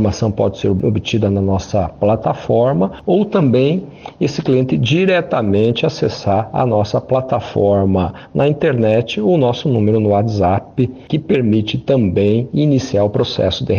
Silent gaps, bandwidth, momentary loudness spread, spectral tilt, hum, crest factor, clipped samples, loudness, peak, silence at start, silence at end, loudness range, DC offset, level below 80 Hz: none; 7 kHz; 5 LU; -7.5 dB/octave; none; 12 dB; under 0.1%; -16 LUFS; -4 dBFS; 0 s; 0 s; 1 LU; under 0.1%; -42 dBFS